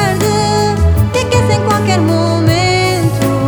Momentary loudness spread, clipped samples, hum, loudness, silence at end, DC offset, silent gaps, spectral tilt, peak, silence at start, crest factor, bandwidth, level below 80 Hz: 2 LU; under 0.1%; none; -12 LUFS; 0 s; under 0.1%; none; -5.5 dB/octave; 0 dBFS; 0 s; 10 dB; over 20 kHz; -24 dBFS